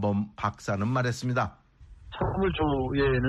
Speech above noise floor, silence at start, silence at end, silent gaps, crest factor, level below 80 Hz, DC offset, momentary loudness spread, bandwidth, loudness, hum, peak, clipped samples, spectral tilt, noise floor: 23 dB; 0 s; 0 s; none; 16 dB; -42 dBFS; under 0.1%; 6 LU; 12 kHz; -28 LUFS; none; -12 dBFS; under 0.1%; -7 dB/octave; -50 dBFS